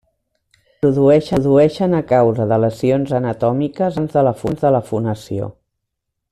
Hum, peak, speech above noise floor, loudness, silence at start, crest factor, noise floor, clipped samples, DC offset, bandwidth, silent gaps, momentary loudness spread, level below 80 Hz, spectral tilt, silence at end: none; -2 dBFS; 61 dB; -16 LUFS; 0.85 s; 14 dB; -77 dBFS; under 0.1%; under 0.1%; 13 kHz; none; 9 LU; -48 dBFS; -8.5 dB/octave; 0.8 s